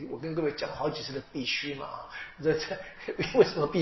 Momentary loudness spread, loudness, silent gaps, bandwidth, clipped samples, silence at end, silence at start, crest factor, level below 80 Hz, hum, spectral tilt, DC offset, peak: 14 LU; -31 LUFS; none; 6.2 kHz; under 0.1%; 0 s; 0 s; 22 dB; -58 dBFS; none; -3.5 dB/octave; under 0.1%; -8 dBFS